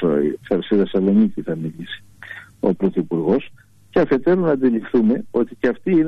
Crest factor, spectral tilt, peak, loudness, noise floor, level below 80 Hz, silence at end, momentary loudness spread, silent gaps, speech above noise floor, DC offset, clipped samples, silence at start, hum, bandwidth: 12 dB; -9 dB/octave; -6 dBFS; -19 LUFS; -39 dBFS; -50 dBFS; 0 s; 15 LU; none; 20 dB; under 0.1%; under 0.1%; 0 s; none; 5.8 kHz